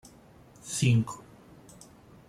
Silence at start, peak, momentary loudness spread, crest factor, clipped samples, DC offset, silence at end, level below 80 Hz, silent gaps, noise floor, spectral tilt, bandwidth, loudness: 0.65 s; -12 dBFS; 26 LU; 20 dB; under 0.1%; under 0.1%; 1.1 s; -62 dBFS; none; -55 dBFS; -5 dB/octave; 14 kHz; -28 LUFS